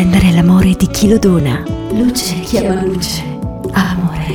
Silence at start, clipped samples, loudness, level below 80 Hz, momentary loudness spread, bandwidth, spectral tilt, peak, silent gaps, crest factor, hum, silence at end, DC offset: 0 s; under 0.1%; -13 LUFS; -28 dBFS; 9 LU; 18 kHz; -6 dB/octave; -2 dBFS; none; 10 dB; none; 0 s; under 0.1%